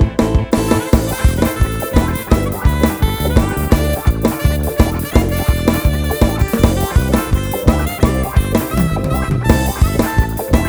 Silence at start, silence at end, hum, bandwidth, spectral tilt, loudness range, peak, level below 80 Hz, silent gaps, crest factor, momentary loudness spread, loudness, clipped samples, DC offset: 0 s; 0 s; none; over 20 kHz; -6 dB/octave; 0 LU; 0 dBFS; -18 dBFS; none; 14 dB; 2 LU; -16 LUFS; 0.2%; under 0.1%